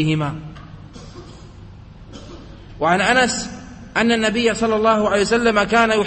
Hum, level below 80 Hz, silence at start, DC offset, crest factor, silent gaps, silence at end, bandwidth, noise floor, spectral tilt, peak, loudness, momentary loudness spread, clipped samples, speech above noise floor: none; -44 dBFS; 0 s; under 0.1%; 18 dB; none; 0 s; 8.8 kHz; -39 dBFS; -4.5 dB/octave; -2 dBFS; -17 LUFS; 23 LU; under 0.1%; 22 dB